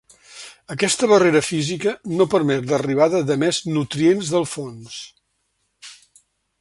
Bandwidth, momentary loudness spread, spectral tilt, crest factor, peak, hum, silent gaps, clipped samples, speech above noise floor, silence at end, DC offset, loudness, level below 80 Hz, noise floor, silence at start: 11.5 kHz; 22 LU; -4.5 dB/octave; 18 dB; -2 dBFS; none; none; under 0.1%; 52 dB; 0.65 s; under 0.1%; -19 LUFS; -60 dBFS; -70 dBFS; 0.3 s